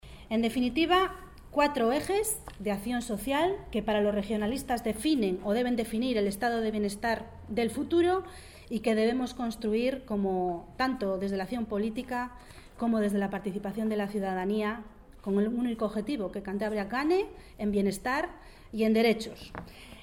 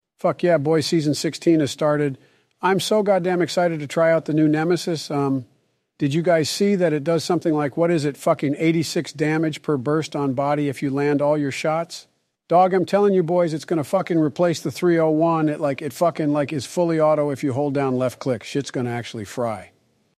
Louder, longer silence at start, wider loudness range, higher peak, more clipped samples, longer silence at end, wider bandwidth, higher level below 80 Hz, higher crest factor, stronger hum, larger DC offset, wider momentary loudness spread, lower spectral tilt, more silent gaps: second, -30 LUFS vs -21 LUFS; second, 0.05 s vs 0.25 s; about the same, 3 LU vs 2 LU; second, -12 dBFS vs -6 dBFS; neither; second, 0 s vs 0.5 s; first, 17.5 kHz vs 15 kHz; first, -52 dBFS vs -66 dBFS; about the same, 18 dB vs 16 dB; neither; neither; about the same, 9 LU vs 7 LU; about the same, -5 dB/octave vs -6 dB/octave; neither